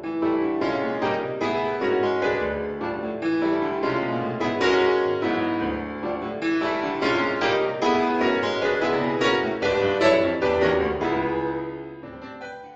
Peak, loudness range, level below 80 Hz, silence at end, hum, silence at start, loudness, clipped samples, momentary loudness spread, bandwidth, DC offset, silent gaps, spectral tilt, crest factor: -6 dBFS; 3 LU; -50 dBFS; 0 s; none; 0 s; -23 LUFS; under 0.1%; 9 LU; 8 kHz; under 0.1%; none; -5.5 dB/octave; 16 dB